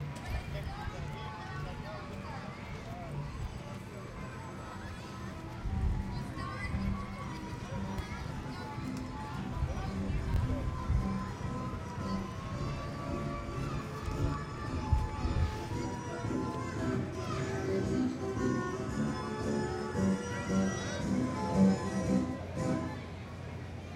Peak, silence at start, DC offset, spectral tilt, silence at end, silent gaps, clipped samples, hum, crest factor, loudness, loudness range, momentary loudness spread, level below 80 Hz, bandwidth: -14 dBFS; 0 s; under 0.1%; -6.5 dB/octave; 0 s; none; under 0.1%; none; 20 dB; -36 LUFS; 9 LU; 11 LU; -44 dBFS; 13.5 kHz